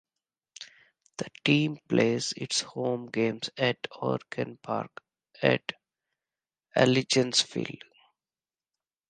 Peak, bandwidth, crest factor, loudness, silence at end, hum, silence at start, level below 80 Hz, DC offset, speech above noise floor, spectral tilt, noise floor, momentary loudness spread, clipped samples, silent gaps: -6 dBFS; 10 kHz; 24 dB; -28 LUFS; 1.35 s; none; 0.6 s; -72 dBFS; under 0.1%; over 62 dB; -4 dB/octave; under -90 dBFS; 18 LU; under 0.1%; none